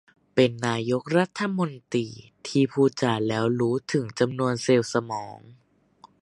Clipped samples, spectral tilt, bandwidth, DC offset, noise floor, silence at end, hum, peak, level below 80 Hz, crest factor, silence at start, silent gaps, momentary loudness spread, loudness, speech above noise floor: under 0.1%; -6 dB/octave; 11.5 kHz; under 0.1%; -56 dBFS; 0.7 s; none; -6 dBFS; -64 dBFS; 20 dB; 0.35 s; none; 7 LU; -25 LUFS; 32 dB